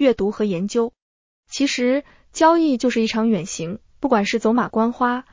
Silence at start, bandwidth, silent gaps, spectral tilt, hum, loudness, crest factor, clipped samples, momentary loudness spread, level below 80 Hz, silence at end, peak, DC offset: 0 s; 7.6 kHz; 1.02-1.43 s; -5 dB/octave; none; -20 LUFS; 16 dB; under 0.1%; 11 LU; -54 dBFS; 0.1 s; -4 dBFS; under 0.1%